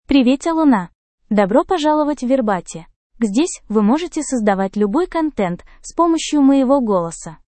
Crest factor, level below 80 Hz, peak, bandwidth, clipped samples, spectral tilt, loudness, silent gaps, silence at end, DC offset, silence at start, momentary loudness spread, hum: 16 dB; -46 dBFS; 0 dBFS; 8.8 kHz; under 0.1%; -5.5 dB/octave; -17 LUFS; 0.95-1.18 s, 2.96-3.10 s; 0.2 s; under 0.1%; 0.1 s; 9 LU; none